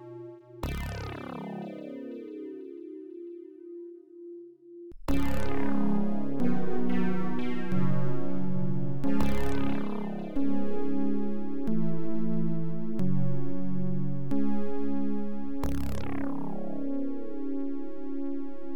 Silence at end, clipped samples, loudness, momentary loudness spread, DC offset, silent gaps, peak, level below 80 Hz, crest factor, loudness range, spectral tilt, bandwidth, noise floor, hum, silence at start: 0 s; under 0.1%; -33 LUFS; 13 LU; under 0.1%; none; -12 dBFS; -46 dBFS; 12 dB; 9 LU; -8 dB/octave; 18.5 kHz; -47 dBFS; none; 0 s